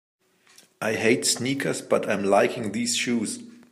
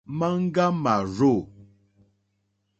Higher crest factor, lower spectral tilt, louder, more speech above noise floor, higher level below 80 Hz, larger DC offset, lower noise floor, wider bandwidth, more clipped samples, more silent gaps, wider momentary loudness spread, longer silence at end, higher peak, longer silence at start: about the same, 18 dB vs 18 dB; second, -3.5 dB/octave vs -7.5 dB/octave; about the same, -24 LUFS vs -23 LUFS; second, 33 dB vs 51 dB; second, -70 dBFS vs -58 dBFS; neither; second, -57 dBFS vs -73 dBFS; first, 15.5 kHz vs 8 kHz; neither; neither; about the same, 8 LU vs 6 LU; second, 0.15 s vs 1.15 s; about the same, -6 dBFS vs -8 dBFS; first, 0.8 s vs 0.1 s